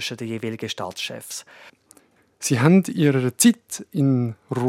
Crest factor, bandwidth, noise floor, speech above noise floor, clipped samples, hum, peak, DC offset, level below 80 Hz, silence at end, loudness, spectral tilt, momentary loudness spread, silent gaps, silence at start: 20 dB; 16.5 kHz; -57 dBFS; 35 dB; under 0.1%; none; -2 dBFS; under 0.1%; -72 dBFS; 0 s; -21 LUFS; -5 dB/octave; 13 LU; none; 0 s